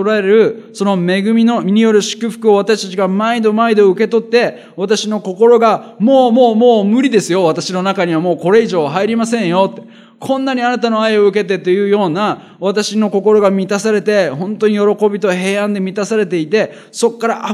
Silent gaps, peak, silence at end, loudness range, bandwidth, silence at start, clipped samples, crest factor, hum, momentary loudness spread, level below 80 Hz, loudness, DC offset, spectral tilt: none; 0 dBFS; 0 s; 3 LU; 12.5 kHz; 0 s; under 0.1%; 12 dB; none; 7 LU; -68 dBFS; -13 LUFS; under 0.1%; -5.5 dB/octave